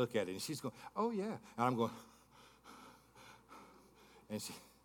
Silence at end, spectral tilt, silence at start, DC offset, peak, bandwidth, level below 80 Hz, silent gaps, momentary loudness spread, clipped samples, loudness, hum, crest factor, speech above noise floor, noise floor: 0.15 s; -5 dB/octave; 0 s; under 0.1%; -20 dBFS; 18 kHz; -78 dBFS; none; 23 LU; under 0.1%; -41 LUFS; none; 22 dB; 24 dB; -64 dBFS